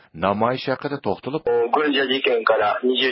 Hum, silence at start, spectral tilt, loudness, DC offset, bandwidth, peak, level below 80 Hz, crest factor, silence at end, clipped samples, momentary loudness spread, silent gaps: none; 0.15 s; -9.5 dB/octave; -21 LUFS; under 0.1%; 5.8 kHz; -4 dBFS; -56 dBFS; 16 dB; 0 s; under 0.1%; 7 LU; none